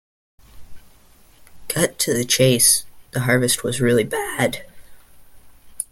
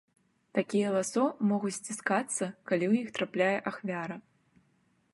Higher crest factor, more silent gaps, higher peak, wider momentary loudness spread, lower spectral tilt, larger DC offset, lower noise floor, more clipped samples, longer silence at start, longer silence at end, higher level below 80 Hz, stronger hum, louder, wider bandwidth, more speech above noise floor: about the same, 20 dB vs 18 dB; neither; first, -2 dBFS vs -12 dBFS; first, 15 LU vs 8 LU; second, -3.5 dB/octave vs -5 dB/octave; neither; second, -52 dBFS vs -71 dBFS; neither; about the same, 0.55 s vs 0.55 s; second, 0.1 s vs 0.95 s; first, -50 dBFS vs -80 dBFS; neither; first, -18 LUFS vs -31 LUFS; first, 17 kHz vs 11.5 kHz; second, 33 dB vs 40 dB